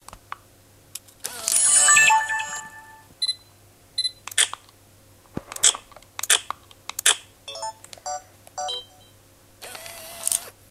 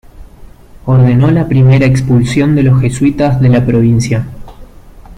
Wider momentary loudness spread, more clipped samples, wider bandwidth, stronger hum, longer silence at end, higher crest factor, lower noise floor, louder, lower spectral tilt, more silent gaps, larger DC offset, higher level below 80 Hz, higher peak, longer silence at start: first, 25 LU vs 6 LU; neither; first, 16 kHz vs 10.5 kHz; neither; first, 0.2 s vs 0.05 s; first, 26 dB vs 10 dB; first, -53 dBFS vs -34 dBFS; second, -20 LUFS vs -10 LUFS; second, 2 dB/octave vs -8 dB/octave; neither; neither; second, -60 dBFS vs -32 dBFS; about the same, 0 dBFS vs 0 dBFS; about the same, 0.15 s vs 0.15 s